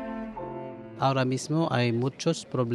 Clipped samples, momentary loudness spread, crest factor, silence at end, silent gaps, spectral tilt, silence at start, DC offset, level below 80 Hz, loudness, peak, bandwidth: under 0.1%; 12 LU; 18 dB; 0 s; none; -6 dB/octave; 0 s; under 0.1%; -60 dBFS; -28 LUFS; -10 dBFS; 11.5 kHz